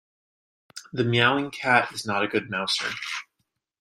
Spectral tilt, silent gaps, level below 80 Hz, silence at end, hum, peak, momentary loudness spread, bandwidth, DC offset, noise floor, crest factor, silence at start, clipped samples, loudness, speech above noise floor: -4 dB/octave; none; -66 dBFS; 0.6 s; none; -4 dBFS; 14 LU; 15.5 kHz; under 0.1%; -77 dBFS; 24 dB; 0.75 s; under 0.1%; -24 LUFS; 53 dB